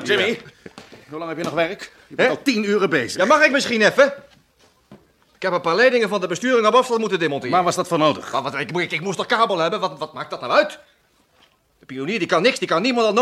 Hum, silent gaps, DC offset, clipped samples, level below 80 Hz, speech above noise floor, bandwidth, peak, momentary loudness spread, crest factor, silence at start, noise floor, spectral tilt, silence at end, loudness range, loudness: none; none; under 0.1%; under 0.1%; -66 dBFS; 40 dB; 14.5 kHz; -2 dBFS; 14 LU; 18 dB; 0 s; -59 dBFS; -4 dB/octave; 0 s; 4 LU; -19 LUFS